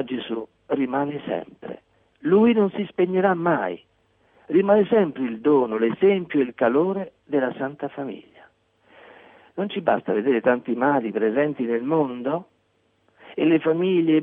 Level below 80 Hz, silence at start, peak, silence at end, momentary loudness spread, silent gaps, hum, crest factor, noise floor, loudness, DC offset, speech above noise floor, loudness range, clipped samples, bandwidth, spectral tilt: -66 dBFS; 0 s; -8 dBFS; 0 s; 13 LU; none; none; 16 dB; -66 dBFS; -22 LUFS; under 0.1%; 45 dB; 6 LU; under 0.1%; 4.3 kHz; -10 dB/octave